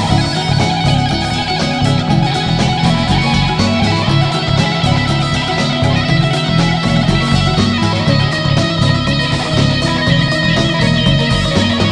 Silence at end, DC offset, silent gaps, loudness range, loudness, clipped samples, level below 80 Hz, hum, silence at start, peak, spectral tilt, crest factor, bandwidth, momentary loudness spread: 0 s; under 0.1%; none; 1 LU; -13 LUFS; under 0.1%; -28 dBFS; none; 0 s; 0 dBFS; -5.5 dB/octave; 12 dB; 10.5 kHz; 2 LU